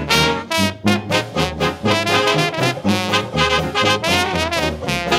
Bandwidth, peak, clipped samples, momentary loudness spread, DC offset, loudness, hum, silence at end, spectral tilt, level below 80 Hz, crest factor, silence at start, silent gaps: 16 kHz; 0 dBFS; under 0.1%; 5 LU; under 0.1%; -17 LUFS; none; 0 s; -4 dB/octave; -38 dBFS; 18 dB; 0 s; none